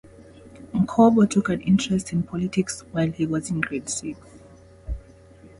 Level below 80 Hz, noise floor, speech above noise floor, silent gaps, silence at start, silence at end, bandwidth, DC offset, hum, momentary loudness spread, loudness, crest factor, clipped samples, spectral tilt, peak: -44 dBFS; -48 dBFS; 27 dB; none; 0.05 s; 0.1 s; 11.5 kHz; under 0.1%; none; 20 LU; -23 LUFS; 20 dB; under 0.1%; -6 dB/octave; -4 dBFS